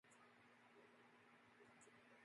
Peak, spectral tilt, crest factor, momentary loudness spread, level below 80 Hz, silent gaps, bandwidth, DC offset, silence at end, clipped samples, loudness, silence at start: -56 dBFS; -3.5 dB/octave; 14 dB; 2 LU; under -90 dBFS; none; 11 kHz; under 0.1%; 0 s; under 0.1%; -69 LUFS; 0.05 s